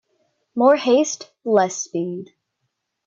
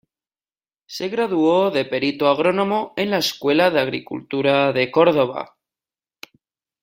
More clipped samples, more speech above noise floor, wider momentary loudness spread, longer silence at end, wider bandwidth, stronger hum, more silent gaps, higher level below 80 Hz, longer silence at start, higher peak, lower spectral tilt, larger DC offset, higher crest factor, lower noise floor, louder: neither; second, 57 dB vs over 71 dB; about the same, 13 LU vs 11 LU; second, 0.8 s vs 1.4 s; second, 7.6 kHz vs 16 kHz; neither; neither; second, -70 dBFS vs -64 dBFS; second, 0.55 s vs 0.9 s; about the same, -4 dBFS vs -2 dBFS; about the same, -4 dB/octave vs -5 dB/octave; neither; about the same, 16 dB vs 18 dB; second, -76 dBFS vs under -90 dBFS; about the same, -19 LUFS vs -19 LUFS